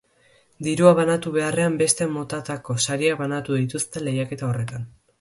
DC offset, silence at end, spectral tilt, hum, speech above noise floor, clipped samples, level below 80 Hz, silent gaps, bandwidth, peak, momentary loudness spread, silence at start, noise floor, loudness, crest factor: under 0.1%; 0.3 s; -5 dB/octave; none; 37 dB; under 0.1%; -58 dBFS; none; 12 kHz; -2 dBFS; 13 LU; 0.6 s; -59 dBFS; -22 LUFS; 22 dB